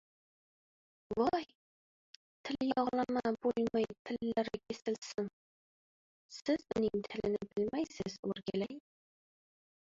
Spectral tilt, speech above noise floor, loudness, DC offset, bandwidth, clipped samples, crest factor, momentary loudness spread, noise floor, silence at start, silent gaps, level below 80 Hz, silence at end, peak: -4.5 dB/octave; over 54 dB; -37 LUFS; under 0.1%; 7.8 kHz; under 0.1%; 18 dB; 9 LU; under -90 dBFS; 1.1 s; 1.55-2.44 s, 3.99-4.05 s, 5.33-6.29 s, 8.19-8.23 s; -68 dBFS; 1.05 s; -20 dBFS